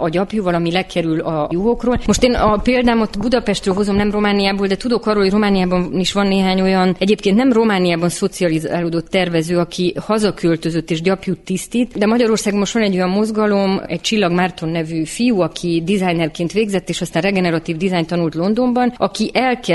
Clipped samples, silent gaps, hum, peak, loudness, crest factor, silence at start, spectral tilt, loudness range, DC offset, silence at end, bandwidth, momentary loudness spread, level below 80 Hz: under 0.1%; none; none; 0 dBFS; -17 LUFS; 16 dB; 0 s; -5.5 dB/octave; 3 LU; under 0.1%; 0 s; 12 kHz; 5 LU; -36 dBFS